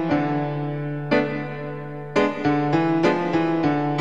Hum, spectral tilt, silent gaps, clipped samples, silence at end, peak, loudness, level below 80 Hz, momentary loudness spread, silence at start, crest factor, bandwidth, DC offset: none; -7.5 dB/octave; none; under 0.1%; 0 s; -6 dBFS; -23 LUFS; -56 dBFS; 9 LU; 0 s; 16 dB; 7.8 kHz; 0.7%